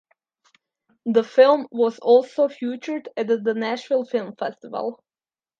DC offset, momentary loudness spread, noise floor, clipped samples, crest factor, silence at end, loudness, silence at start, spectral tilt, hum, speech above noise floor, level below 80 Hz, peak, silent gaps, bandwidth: under 0.1%; 14 LU; under -90 dBFS; under 0.1%; 20 dB; 0.65 s; -22 LUFS; 1.05 s; -5.5 dB/octave; none; over 69 dB; -80 dBFS; -2 dBFS; none; 7.4 kHz